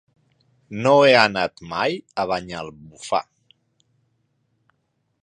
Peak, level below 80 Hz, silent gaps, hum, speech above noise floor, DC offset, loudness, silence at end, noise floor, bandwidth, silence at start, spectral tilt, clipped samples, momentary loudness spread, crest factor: 0 dBFS; -60 dBFS; none; none; 51 dB; under 0.1%; -19 LUFS; 2 s; -71 dBFS; 10 kHz; 0.7 s; -4.5 dB/octave; under 0.1%; 20 LU; 22 dB